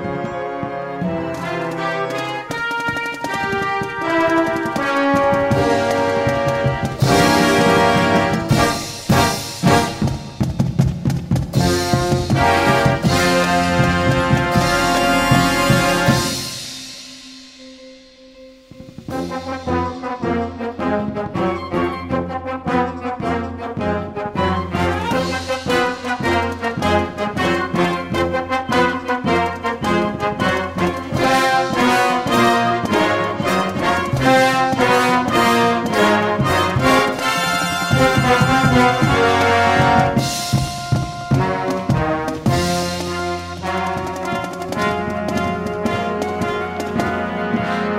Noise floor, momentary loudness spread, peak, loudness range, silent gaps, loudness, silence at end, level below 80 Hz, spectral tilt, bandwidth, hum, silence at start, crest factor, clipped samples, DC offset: -43 dBFS; 9 LU; 0 dBFS; 7 LU; none; -18 LUFS; 0 s; -38 dBFS; -5 dB/octave; 16 kHz; none; 0 s; 18 dB; under 0.1%; under 0.1%